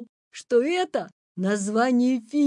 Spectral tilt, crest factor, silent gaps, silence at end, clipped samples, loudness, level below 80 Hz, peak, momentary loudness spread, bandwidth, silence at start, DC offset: -5 dB/octave; 14 dB; 0.09-0.31 s, 1.12-1.35 s; 0 s; under 0.1%; -24 LUFS; -80 dBFS; -10 dBFS; 18 LU; 11 kHz; 0 s; under 0.1%